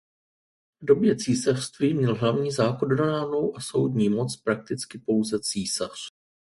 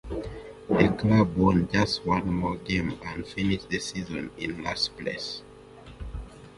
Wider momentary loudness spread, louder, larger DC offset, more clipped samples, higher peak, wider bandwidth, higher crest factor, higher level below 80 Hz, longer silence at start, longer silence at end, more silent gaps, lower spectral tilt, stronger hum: second, 8 LU vs 18 LU; about the same, -25 LUFS vs -27 LUFS; neither; neither; about the same, -6 dBFS vs -4 dBFS; about the same, 11.5 kHz vs 11.5 kHz; about the same, 20 dB vs 24 dB; second, -62 dBFS vs -44 dBFS; first, 0.8 s vs 0.05 s; first, 0.4 s vs 0 s; neither; about the same, -5.5 dB/octave vs -6 dB/octave; neither